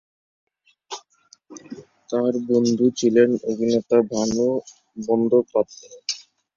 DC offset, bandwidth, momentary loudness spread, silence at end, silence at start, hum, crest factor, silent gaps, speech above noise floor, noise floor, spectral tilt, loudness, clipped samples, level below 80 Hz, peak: under 0.1%; 7.6 kHz; 19 LU; 0.4 s; 0.9 s; none; 18 dB; none; 37 dB; -56 dBFS; -5 dB/octave; -21 LUFS; under 0.1%; -62 dBFS; -4 dBFS